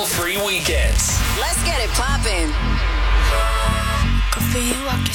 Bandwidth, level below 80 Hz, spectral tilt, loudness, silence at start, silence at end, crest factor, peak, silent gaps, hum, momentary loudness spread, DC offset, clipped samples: 19 kHz; -20 dBFS; -3.5 dB/octave; -19 LUFS; 0 s; 0 s; 16 dB; -2 dBFS; none; none; 3 LU; under 0.1%; under 0.1%